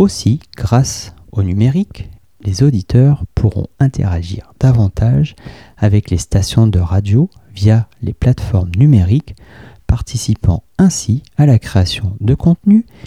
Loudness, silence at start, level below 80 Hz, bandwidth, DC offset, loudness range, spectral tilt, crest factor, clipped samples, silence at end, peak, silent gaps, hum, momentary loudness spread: -14 LUFS; 0 s; -28 dBFS; 13 kHz; 0.4%; 2 LU; -7 dB/octave; 12 dB; under 0.1%; 0.25 s; 0 dBFS; none; none; 8 LU